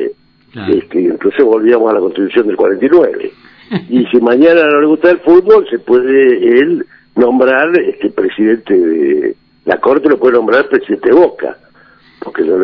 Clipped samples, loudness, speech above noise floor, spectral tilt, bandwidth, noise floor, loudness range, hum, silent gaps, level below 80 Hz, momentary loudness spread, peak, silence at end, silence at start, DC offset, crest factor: 2%; -10 LUFS; 35 dB; -8.5 dB/octave; 5.4 kHz; -44 dBFS; 3 LU; none; none; -52 dBFS; 12 LU; 0 dBFS; 0 s; 0 s; under 0.1%; 10 dB